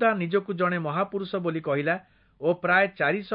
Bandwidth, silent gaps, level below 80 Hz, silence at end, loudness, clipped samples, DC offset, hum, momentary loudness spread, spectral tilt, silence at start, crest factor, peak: 5.2 kHz; none; -68 dBFS; 0 s; -26 LUFS; under 0.1%; under 0.1%; none; 7 LU; -10.5 dB/octave; 0 s; 18 dB; -8 dBFS